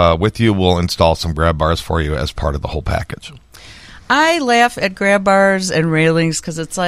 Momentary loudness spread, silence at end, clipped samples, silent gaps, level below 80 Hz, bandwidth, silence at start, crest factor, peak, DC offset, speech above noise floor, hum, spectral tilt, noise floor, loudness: 9 LU; 0 s; under 0.1%; none; -30 dBFS; 15 kHz; 0 s; 16 dB; 0 dBFS; under 0.1%; 23 dB; none; -5 dB/octave; -38 dBFS; -15 LUFS